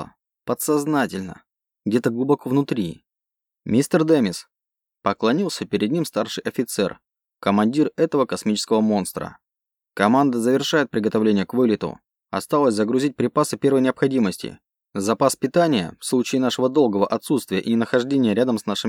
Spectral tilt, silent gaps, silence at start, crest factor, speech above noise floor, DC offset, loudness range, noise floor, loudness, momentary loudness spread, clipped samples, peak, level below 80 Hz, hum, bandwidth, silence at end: -5.5 dB/octave; none; 0 s; 20 dB; 67 dB; under 0.1%; 3 LU; -87 dBFS; -21 LUFS; 11 LU; under 0.1%; -2 dBFS; -62 dBFS; none; 17.5 kHz; 0 s